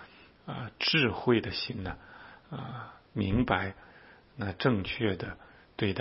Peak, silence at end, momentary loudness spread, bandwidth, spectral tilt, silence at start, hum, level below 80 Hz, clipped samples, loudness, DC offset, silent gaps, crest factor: -10 dBFS; 0 s; 22 LU; 5.8 kHz; -9 dB/octave; 0 s; none; -52 dBFS; under 0.1%; -31 LUFS; under 0.1%; none; 24 dB